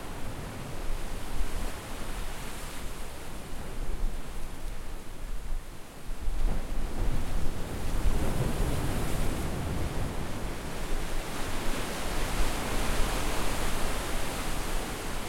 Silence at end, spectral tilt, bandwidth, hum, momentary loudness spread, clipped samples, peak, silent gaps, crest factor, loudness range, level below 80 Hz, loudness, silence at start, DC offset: 0 s; -4.5 dB/octave; 16.5 kHz; none; 10 LU; under 0.1%; -12 dBFS; none; 16 dB; 8 LU; -32 dBFS; -35 LUFS; 0 s; under 0.1%